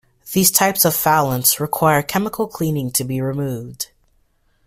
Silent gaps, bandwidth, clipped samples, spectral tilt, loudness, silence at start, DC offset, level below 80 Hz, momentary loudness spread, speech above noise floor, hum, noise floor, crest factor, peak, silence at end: none; 16 kHz; under 0.1%; -3.5 dB/octave; -17 LUFS; 0.25 s; under 0.1%; -52 dBFS; 12 LU; 43 dB; none; -61 dBFS; 20 dB; 0 dBFS; 0.8 s